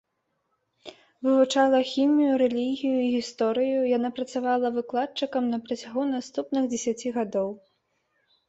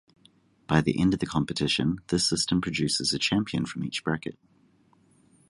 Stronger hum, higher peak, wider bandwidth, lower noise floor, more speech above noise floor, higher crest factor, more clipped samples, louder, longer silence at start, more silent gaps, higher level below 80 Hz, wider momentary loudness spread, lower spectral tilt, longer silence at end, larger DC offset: neither; about the same, -8 dBFS vs -6 dBFS; second, 8.2 kHz vs 11.5 kHz; first, -76 dBFS vs -62 dBFS; first, 51 dB vs 36 dB; about the same, 18 dB vs 22 dB; neither; about the same, -25 LUFS vs -26 LUFS; first, 0.85 s vs 0.7 s; neither; second, -72 dBFS vs -52 dBFS; about the same, 8 LU vs 7 LU; about the same, -4 dB/octave vs -4.5 dB/octave; second, 0.9 s vs 1.15 s; neither